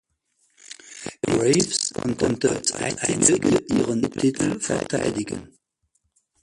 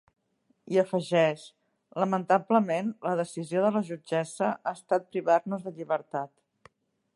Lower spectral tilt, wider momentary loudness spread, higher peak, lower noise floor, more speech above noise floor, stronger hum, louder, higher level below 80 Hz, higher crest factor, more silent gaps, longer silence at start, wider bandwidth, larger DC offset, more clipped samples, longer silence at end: second, -4 dB/octave vs -6 dB/octave; first, 17 LU vs 11 LU; first, 0 dBFS vs -8 dBFS; about the same, -71 dBFS vs -72 dBFS; first, 49 dB vs 45 dB; neither; first, -22 LUFS vs -28 LUFS; first, -52 dBFS vs -80 dBFS; about the same, 24 dB vs 20 dB; neither; about the same, 0.7 s vs 0.7 s; about the same, 11.5 kHz vs 11.5 kHz; neither; neither; about the same, 0.95 s vs 0.9 s